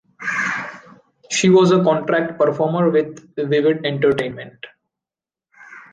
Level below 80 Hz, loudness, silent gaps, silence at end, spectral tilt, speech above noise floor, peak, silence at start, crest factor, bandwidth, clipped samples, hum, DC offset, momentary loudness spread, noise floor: -60 dBFS; -18 LUFS; none; 0.1 s; -5.5 dB/octave; 73 dB; -4 dBFS; 0.2 s; 16 dB; 9.8 kHz; under 0.1%; none; under 0.1%; 15 LU; -90 dBFS